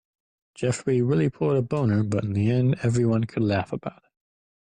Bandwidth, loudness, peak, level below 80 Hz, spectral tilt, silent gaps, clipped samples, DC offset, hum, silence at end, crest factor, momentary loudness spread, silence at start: 9.8 kHz; -24 LUFS; -12 dBFS; -56 dBFS; -7.5 dB/octave; none; under 0.1%; under 0.1%; none; 0.8 s; 12 dB; 6 LU; 0.6 s